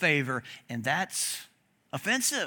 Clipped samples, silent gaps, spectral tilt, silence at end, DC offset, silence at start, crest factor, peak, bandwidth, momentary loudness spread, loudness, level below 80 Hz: under 0.1%; none; -2.5 dB/octave; 0 s; under 0.1%; 0 s; 20 dB; -10 dBFS; 18 kHz; 12 LU; -30 LUFS; -76 dBFS